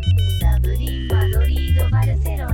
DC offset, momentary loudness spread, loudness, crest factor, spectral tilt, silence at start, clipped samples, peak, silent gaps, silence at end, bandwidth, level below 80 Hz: under 0.1%; 4 LU; -19 LUFS; 10 dB; -6.5 dB/octave; 0 s; under 0.1%; -6 dBFS; none; 0 s; 17 kHz; -20 dBFS